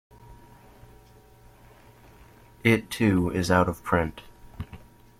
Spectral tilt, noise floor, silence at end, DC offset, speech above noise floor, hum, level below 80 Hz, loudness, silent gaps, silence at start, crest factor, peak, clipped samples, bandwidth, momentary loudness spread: -6 dB/octave; -53 dBFS; 0.4 s; under 0.1%; 30 dB; none; -50 dBFS; -24 LUFS; none; 0.3 s; 22 dB; -6 dBFS; under 0.1%; 16 kHz; 19 LU